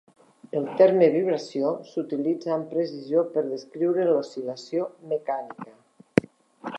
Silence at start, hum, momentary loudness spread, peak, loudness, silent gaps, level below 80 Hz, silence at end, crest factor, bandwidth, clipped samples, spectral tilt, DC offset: 0.55 s; none; 13 LU; -2 dBFS; -25 LUFS; none; -68 dBFS; 0 s; 24 dB; 11 kHz; under 0.1%; -7 dB/octave; under 0.1%